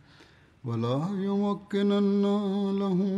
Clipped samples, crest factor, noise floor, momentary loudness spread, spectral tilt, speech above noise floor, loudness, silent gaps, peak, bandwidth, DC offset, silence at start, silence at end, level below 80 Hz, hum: under 0.1%; 10 dB; -56 dBFS; 6 LU; -8.5 dB/octave; 30 dB; -27 LUFS; none; -16 dBFS; 7.8 kHz; under 0.1%; 0.65 s; 0 s; -70 dBFS; none